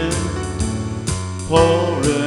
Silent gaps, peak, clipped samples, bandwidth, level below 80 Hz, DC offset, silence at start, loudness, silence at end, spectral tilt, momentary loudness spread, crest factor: none; 0 dBFS; under 0.1%; 12 kHz; -32 dBFS; under 0.1%; 0 s; -19 LUFS; 0 s; -5 dB/octave; 9 LU; 18 dB